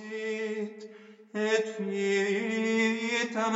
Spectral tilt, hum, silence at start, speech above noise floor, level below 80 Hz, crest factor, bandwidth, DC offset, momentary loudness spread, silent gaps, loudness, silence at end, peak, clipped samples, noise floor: -4 dB/octave; none; 0 s; 21 dB; under -90 dBFS; 16 dB; 8 kHz; under 0.1%; 13 LU; none; -29 LUFS; 0 s; -14 dBFS; under 0.1%; -50 dBFS